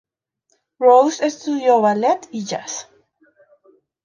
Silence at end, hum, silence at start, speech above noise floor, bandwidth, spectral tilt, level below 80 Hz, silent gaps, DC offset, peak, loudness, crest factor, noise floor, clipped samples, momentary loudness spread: 1.2 s; none; 0.8 s; 52 dB; 7.4 kHz; -4 dB/octave; -74 dBFS; none; under 0.1%; -2 dBFS; -17 LUFS; 18 dB; -68 dBFS; under 0.1%; 14 LU